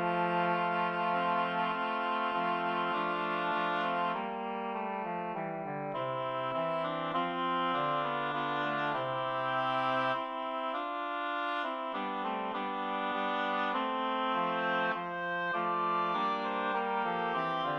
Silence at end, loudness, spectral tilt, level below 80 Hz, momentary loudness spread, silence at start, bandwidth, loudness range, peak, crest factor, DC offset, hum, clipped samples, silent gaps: 0 s; -33 LUFS; -6.5 dB/octave; -82 dBFS; 5 LU; 0 s; 8.8 kHz; 3 LU; -18 dBFS; 14 dB; under 0.1%; none; under 0.1%; none